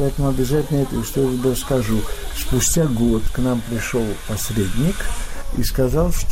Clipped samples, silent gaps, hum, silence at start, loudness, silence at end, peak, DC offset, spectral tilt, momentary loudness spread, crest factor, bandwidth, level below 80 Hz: under 0.1%; none; none; 0 s; -21 LUFS; 0 s; -6 dBFS; under 0.1%; -5 dB/octave; 8 LU; 12 dB; 16.5 kHz; -26 dBFS